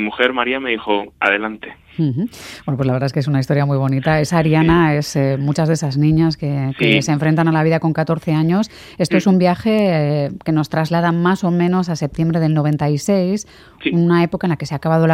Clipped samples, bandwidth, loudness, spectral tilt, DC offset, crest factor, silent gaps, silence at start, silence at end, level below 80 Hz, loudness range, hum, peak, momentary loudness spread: under 0.1%; 13.5 kHz; -17 LUFS; -6.5 dB/octave; under 0.1%; 16 dB; none; 0 s; 0 s; -44 dBFS; 3 LU; none; 0 dBFS; 7 LU